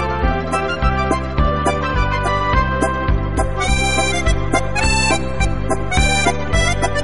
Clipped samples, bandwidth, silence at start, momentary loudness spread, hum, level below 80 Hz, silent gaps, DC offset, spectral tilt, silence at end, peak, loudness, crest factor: under 0.1%; 11.5 kHz; 0 s; 4 LU; none; -22 dBFS; none; under 0.1%; -4.5 dB/octave; 0 s; -2 dBFS; -18 LUFS; 16 dB